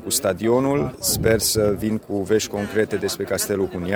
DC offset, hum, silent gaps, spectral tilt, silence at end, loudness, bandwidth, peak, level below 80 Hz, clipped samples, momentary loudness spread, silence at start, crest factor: under 0.1%; none; none; -4 dB/octave; 0 s; -21 LUFS; over 20 kHz; -4 dBFS; -44 dBFS; under 0.1%; 6 LU; 0 s; 18 dB